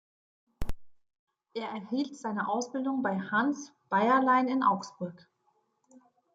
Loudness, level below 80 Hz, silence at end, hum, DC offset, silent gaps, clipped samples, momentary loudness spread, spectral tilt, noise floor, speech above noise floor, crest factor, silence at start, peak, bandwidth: -29 LUFS; -52 dBFS; 1.2 s; none; under 0.1%; 1.19-1.27 s; under 0.1%; 18 LU; -5.5 dB/octave; -74 dBFS; 44 dB; 18 dB; 0.6 s; -14 dBFS; 8 kHz